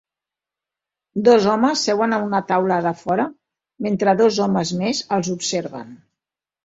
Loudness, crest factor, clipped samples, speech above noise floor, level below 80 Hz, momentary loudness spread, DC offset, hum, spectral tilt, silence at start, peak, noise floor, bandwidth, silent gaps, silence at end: -19 LUFS; 18 dB; under 0.1%; 69 dB; -62 dBFS; 11 LU; under 0.1%; none; -5 dB/octave; 1.15 s; -2 dBFS; -88 dBFS; 8 kHz; none; 0.7 s